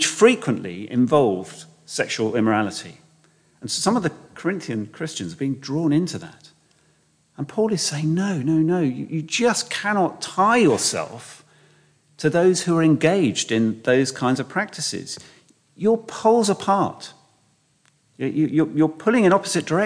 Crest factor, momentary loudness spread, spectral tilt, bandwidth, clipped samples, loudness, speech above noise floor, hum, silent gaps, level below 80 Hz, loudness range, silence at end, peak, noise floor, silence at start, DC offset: 18 dB; 13 LU; -4.5 dB/octave; 10.5 kHz; under 0.1%; -21 LUFS; 42 dB; none; none; -66 dBFS; 5 LU; 0 s; -2 dBFS; -63 dBFS; 0 s; under 0.1%